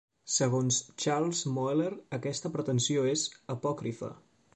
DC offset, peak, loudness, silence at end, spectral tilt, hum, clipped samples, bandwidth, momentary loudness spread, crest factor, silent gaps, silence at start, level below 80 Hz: under 0.1%; -16 dBFS; -31 LUFS; 0.4 s; -4.5 dB/octave; none; under 0.1%; 9 kHz; 8 LU; 16 dB; none; 0.25 s; -70 dBFS